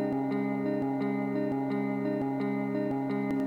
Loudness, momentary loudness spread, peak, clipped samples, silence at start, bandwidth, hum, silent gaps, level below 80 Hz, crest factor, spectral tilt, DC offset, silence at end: -31 LUFS; 1 LU; -20 dBFS; under 0.1%; 0 s; 5.2 kHz; none; none; -66 dBFS; 10 dB; -9 dB/octave; under 0.1%; 0 s